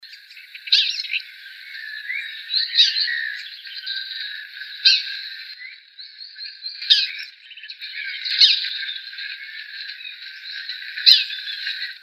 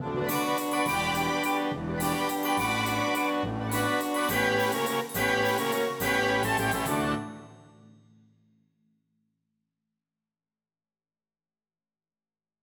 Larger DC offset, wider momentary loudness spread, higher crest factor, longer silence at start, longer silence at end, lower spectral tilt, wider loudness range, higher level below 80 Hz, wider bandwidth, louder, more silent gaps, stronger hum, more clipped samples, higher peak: neither; first, 22 LU vs 5 LU; first, 24 dB vs 18 dB; about the same, 0 s vs 0 s; second, 0 s vs 5 s; second, 10 dB/octave vs -4 dB/octave; second, 3 LU vs 6 LU; second, under -90 dBFS vs -54 dBFS; second, 15.5 kHz vs over 20 kHz; first, -19 LUFS vs -27 LUFS; neither; neither; neither; first, 0 dBFS vs -12 dBFS